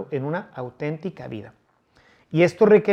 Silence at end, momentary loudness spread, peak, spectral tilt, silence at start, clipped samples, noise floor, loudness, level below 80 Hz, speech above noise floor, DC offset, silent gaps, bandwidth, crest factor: 0 s; 20 LU; -4 dBFS; -7.5 dB/octave; 0 s; under 0.1%; -60 dBFS; -22 LUFS; -64 dBFS; 38 dB; under 0.1%; none; 9 kHz; 18 dB